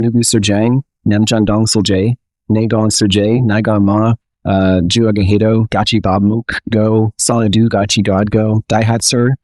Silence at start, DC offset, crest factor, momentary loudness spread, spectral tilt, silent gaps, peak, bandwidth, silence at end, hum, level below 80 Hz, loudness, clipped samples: 0 s; 0.3%; 12 dB; 5 LU; -5 dB/octave; none; 0 dBFS; 13.5 kHz; 0.05 s; none; -40 dBFS; -13 LUFS; under 0.1%